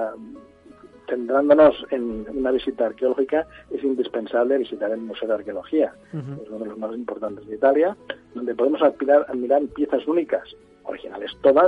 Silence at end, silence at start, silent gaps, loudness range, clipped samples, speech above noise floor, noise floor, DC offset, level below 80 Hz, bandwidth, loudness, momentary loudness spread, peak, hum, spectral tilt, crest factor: 0 s; 0 s; none; 4 LU; under 0.1%; 26 dB; -48 dBFS; under 0.1%; -56 dBFS; 4.8 kHz; -22 LUFS; 16 LU; -4 dBFS; none; -8 dB/octave; 18 dB